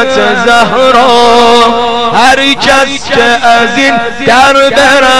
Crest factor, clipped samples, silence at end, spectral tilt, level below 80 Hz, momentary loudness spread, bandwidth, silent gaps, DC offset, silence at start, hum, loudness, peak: 6 dB; 5%; 0 s; -2.5 dB/octave; -34 dBFS; 4 LU; 16 kHz; none; 8%; 0 s; none; -5 LUFS; 0 dBFS